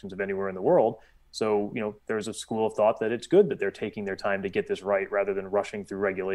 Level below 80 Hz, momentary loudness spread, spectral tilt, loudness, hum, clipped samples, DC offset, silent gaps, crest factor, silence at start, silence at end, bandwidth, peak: -62 dBFS; 10 LU; -5.5 dB/octave; -27 LUFS; none; under 0.1%; under 0.1%; none; 18 dB; 0.05 s; 0 s; 12 kHz; -10 dBFS